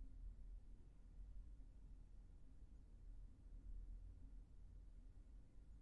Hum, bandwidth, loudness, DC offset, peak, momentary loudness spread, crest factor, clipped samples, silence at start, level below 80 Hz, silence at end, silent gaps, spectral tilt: none; 5.6 kHz; -64 LUFS; under 0.1%; -46 dBFS; 6 LU; 12 dB; under 0.1%; 0 s; -60 dBFS; 0 s; none; -9 dB/octave